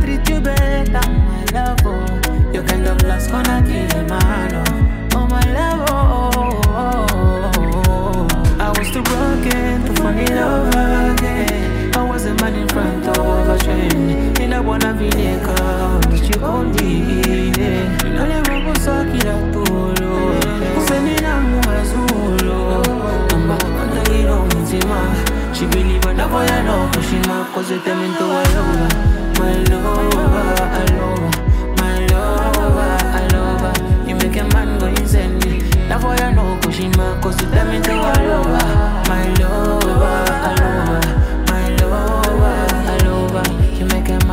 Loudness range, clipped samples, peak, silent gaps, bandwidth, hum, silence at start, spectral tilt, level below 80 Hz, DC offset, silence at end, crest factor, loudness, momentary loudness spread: 1 LU; under 0.1%; -2 dBFS; none; 16.5 kHz; none; 0 s; -5.5 dB/octave; -18 dBFS; under 0.1%; 0 s; 12 dB; -16 LUFS; 3 LU